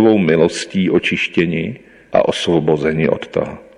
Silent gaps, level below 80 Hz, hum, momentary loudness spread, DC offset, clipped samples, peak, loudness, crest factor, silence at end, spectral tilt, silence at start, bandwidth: none; -48 dBFS; none; 9 LU; under 0.1%; under 0.1%; -2 dBFS; -16 LUFS; 14 dB; 0.15 s; -6 dB/octave; 0 s; 11.5 kHz